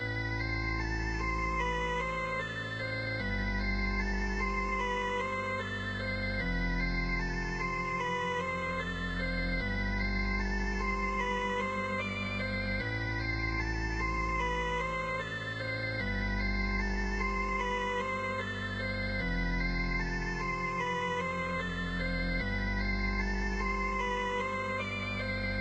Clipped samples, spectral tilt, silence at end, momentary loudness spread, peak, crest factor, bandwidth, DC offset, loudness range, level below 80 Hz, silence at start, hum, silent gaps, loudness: under 0.1%; -5.5 dB/octave; 0 s; 2 LU; -20 dBFS; 14 dB; 8.4 kHz; under 0.1%; 0 LU; -38 dBFS; 0 s; none; none; -33 LUFS